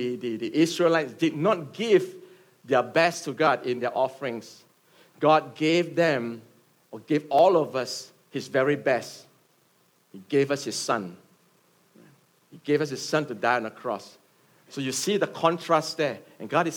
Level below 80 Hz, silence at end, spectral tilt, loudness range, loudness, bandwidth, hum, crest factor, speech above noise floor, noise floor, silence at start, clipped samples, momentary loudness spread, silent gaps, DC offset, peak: -80 dBFS; 0 s; -4.5 dB/octave; 6 LU; -25 LUFS; 18 kHz; none; 20 dB; 40 dB; -65 dBFS; 0 s; under 0.1%; 14 LU; none; under 0.1%; -6 dBFS